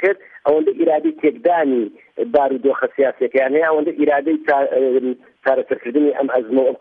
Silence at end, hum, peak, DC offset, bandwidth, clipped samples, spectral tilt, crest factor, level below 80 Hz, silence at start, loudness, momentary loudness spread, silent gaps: 0.05 s; none; -2 dBFS; under 0.1%; 4.5 kHz; under 0.1%; -8 dB/octave; 14 dB; -64 dBFS; 0 s; -18 LUFS; 4 LU; none